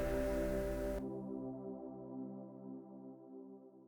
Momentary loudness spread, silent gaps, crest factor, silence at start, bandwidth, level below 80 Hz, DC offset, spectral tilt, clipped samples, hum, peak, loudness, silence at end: 16 LU; none; 18 dB; 0 s; over 20 kHz; -50 dBFS; under 0.1%; -7 dB/octave; under 0.1%; none; -26 dBFS; -43 LUFS; 0 s